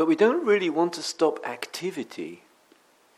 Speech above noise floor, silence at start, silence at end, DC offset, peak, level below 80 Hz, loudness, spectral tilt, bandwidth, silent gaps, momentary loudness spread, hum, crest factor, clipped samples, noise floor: 35 dB; 0 s; 0.8 s; under 0.1%; -8 dBFS; -82 dBFS; -25 LUFS; -4.5 dB/octave; 15 kHz; none; 15 LU; none; 18 dB; under 0.1%; -60 dBFS